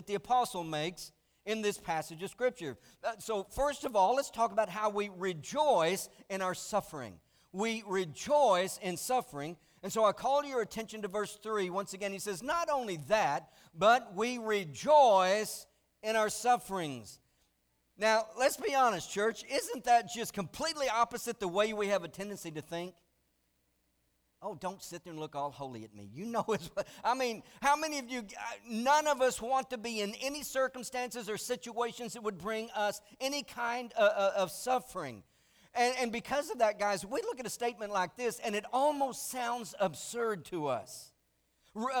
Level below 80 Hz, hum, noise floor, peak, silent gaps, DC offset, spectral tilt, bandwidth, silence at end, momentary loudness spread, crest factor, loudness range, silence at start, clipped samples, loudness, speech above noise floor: -66 dBFS; none; -76 dBFS; -14 dBFS; none; under 0.1%; -3.5 dB/octave; over 20 kHz; 0 s; 13 LU; 20 dB; 7 LU; 0 s; under 0.1%; -33 LUFS; 43 dB